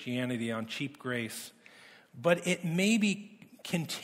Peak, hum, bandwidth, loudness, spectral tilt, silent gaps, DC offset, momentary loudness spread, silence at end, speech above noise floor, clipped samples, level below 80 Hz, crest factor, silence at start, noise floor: -12 dBFS; none; 16 kHz; -32 LUFS; -4.5 dB/octave; none; under 0.1%; 15 LU; 0 s; 25 dB; under 0.1%; -76 dBFS; 20 dB; 0 s; -56 dBFS